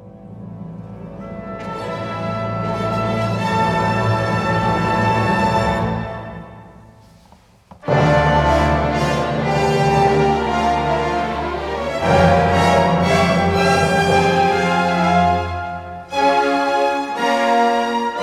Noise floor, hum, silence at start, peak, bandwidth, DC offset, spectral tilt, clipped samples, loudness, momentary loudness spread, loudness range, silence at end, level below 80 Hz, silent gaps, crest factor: -49 dBFS; none; 0 s; 0 dBFS; 14.5 kHz; under 0.1%; -6 dB/octave; under 0.1%; -17 LUFS; 15 LU; 6 LU; 0 s; -36 dBFS; none; 16 dB